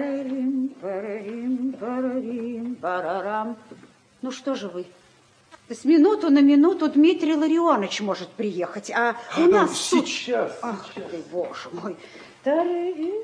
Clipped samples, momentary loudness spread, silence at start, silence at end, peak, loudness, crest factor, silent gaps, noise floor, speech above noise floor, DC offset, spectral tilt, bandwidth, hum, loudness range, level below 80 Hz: under 0.1%; 17 LU; 0 s; 0 s; -6 dBFS; -23 LUFS; 16 dB; none; -56 dBFS; 34 dB; under 0.1%; -4.5 dB/octave; 10.5 kHz; none; 10 LU; -72 dBFS